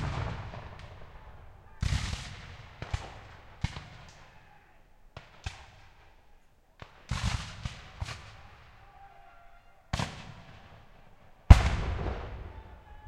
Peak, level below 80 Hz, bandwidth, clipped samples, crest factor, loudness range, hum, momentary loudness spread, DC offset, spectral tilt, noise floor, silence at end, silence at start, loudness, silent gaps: -2 dBFS; -34 dBFS; 11 kHz; under 0.1%; 30 dB; 16 LU; none; 21 LU; under 0.1%; -5.5 dB/octave; -59 dBFS; 0.1 s; 0 s; -31 LUFS; none